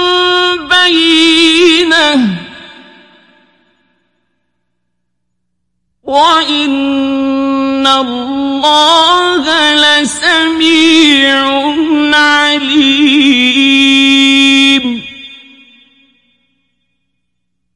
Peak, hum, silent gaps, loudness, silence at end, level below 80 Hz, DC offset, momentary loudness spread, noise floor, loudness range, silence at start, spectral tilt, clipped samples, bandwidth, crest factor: 0 dBFS; 60 Hz at -60 dBFS; none; -7 LUFS; 2.4 s; -50 dBFS; under 0.1%; 8 LU; -70 dBFS; 8 LU; 0 s; -2 dB/octave; 0.3%; 11.5 kHz; 10 dB